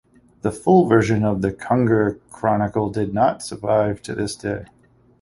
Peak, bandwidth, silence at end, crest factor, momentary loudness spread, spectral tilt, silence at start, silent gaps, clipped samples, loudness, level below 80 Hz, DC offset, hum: -2 dBFS; 11.5 kHz; 0.6 s; 18 dB; 11 LU; -7 dB/octave; 0.45 s; none; under 0.1%; -20 LUFS; -48 dBFS; under 0.1%; none